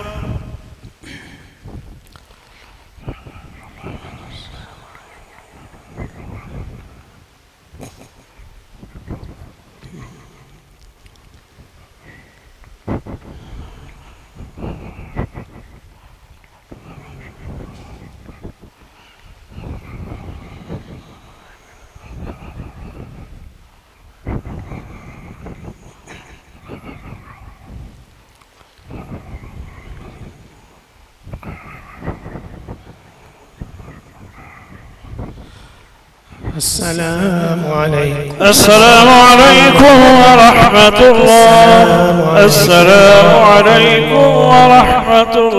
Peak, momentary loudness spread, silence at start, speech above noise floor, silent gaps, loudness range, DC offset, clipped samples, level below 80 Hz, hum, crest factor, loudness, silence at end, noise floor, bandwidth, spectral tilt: 0 dBFS; 29 LU; 0 s; 43 dB; none; 29 LU; under 0.1%; 0.4%; -36 dBFS; none; 12 dB; -6 LUFS; 0 s; -49 dBFS; 16 kHz; -4 dB/octave